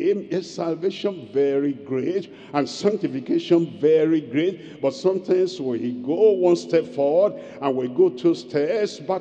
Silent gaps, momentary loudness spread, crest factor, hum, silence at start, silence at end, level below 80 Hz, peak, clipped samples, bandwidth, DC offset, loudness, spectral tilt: none; 8 LU; 16 dB; none; 0 s; 0 s; -72 dBFS; -6 dBFS; under 0.1%; 8.6 kHz; under 0.1%; -22 LUFS; -6.5 dB/octave